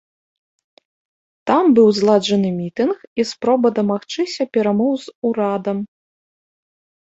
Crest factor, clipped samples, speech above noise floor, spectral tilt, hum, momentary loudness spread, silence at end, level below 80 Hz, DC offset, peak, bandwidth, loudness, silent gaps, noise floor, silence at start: 16 dB; under 0.1%; over 73 dB; -6 dB/octave; none; 10 LU; 1.2 s; -64 dBFS; under 0.1%; -2 dBFS; 8 kHz; -18 LUFS; 3.07-3.16 s, 5.15-5.22 s; under -90 dBFS; 1.45 s